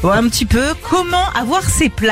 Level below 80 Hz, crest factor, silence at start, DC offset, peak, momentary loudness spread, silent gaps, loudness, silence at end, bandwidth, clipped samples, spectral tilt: -26 dBFS; 10 dB; 0 s; under 0.1%; -4 dBFS; 2 LU; none; -15 LUFS; 0 s; 16 kHz; under 0.1%; -4 dB/octave